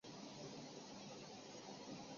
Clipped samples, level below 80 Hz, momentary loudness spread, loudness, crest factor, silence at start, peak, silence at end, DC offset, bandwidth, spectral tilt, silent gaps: under 0.1%; -84 dBFS; 1 LU; -54 LUFS; 14 dB; 0.05 s; -40 dBFS; 0 s; under 0.1%; 7.4 kHz; -3.5 dB/octave; none